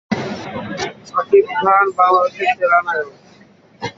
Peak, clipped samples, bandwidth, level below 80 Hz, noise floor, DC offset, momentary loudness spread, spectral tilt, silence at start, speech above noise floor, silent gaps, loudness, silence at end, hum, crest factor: -2 dBFS; under 0.1%; 7.8 kHz; -56 dBFS; -48 dBFS; under 0.1%; 14 LU; -5 dB/octave; 0.1 s; 32 dB; none; -16 LUFS; 0.05 s; none; 16 dB